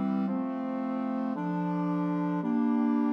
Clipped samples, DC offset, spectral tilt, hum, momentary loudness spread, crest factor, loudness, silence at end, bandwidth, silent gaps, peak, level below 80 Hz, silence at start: under 0.1%; under 0.1%; -10 dB/octave; none; 5 LU; 10 dB; -30 LUFS; 0 s; 6 kHz; none; -20 dBFS; -86 dBFS; 0 s